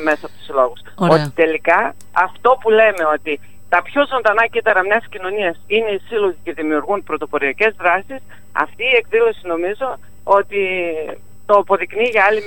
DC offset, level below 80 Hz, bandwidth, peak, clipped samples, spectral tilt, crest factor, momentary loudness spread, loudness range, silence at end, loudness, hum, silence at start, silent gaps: 2%; -52 dBFS; 16.5 kHz; 0 dBFS; under 0.1%; -5.5 dB/octave; 16 dB; 11 LU; 3 LU; 0 s; -17 LUFS; none; 0 s; none